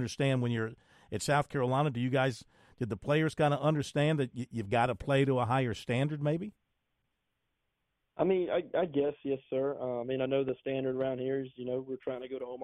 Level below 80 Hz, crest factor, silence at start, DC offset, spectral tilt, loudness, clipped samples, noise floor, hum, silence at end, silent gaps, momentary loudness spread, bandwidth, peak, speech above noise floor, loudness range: -62 dBFS; 18 dB; 0 s; under 0.1%; -6.5 dB/octave; -32 LUFS; under 0.1%; -82 dBFS; none; 0 s; none; 10 LU; 13 kHz; -16 dBFS; 51 dB; 4 LU